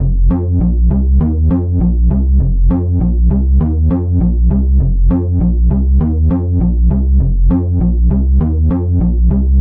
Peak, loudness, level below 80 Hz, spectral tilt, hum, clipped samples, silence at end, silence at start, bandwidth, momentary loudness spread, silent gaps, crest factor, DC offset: -2 dBFS; -13 LUFS; -12 dBFS; -15 dB/octave; none; under 0.1%; 0 s; 0 s; 1.9 kHz; 2 LU; none; 8 dB; under 0.1%